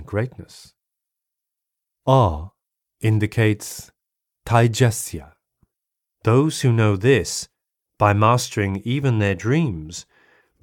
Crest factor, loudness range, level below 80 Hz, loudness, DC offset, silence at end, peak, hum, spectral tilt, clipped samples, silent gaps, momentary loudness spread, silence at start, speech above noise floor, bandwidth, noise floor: 20 dB; 3 LU; -46 dBFS; -20 LUFS; under 0.1%; 0.6 s; -2 dBFS; none; -6 dB/octave; under 0.1%; none; 18 LU; 0 s; 65 dB; 16.5 kHz; -84 dBFS